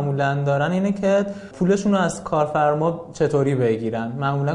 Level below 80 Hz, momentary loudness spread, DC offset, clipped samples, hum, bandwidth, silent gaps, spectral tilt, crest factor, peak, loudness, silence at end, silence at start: -52 dBFS; 5 LU; under 0.1%; under 0.1%; none; 11 kHz; none; -7 dB/octave; 14 dB; -6 dBFS; -21 LUFS; 0 s; 0 s